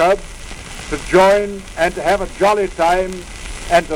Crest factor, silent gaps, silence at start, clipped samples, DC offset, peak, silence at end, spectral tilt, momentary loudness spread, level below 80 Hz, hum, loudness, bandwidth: 14 dB; none; 0 s; under 0.1%; under 0.1%; -2 dBFS; 0 s; -4.5 dB/octave; 18 LU; -34 dBFS; none; -16 LUFS; 17.5 kHz